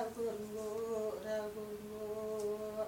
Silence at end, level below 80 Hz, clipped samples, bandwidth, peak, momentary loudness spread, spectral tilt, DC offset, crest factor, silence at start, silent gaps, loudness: 0 s; -68 dBFS; under 0.1%; 17 kHz; -28 dBFS; 5 LU; -5 dB/octave; under 0.1%; 14 dB; 0 s; none; -41 LUFS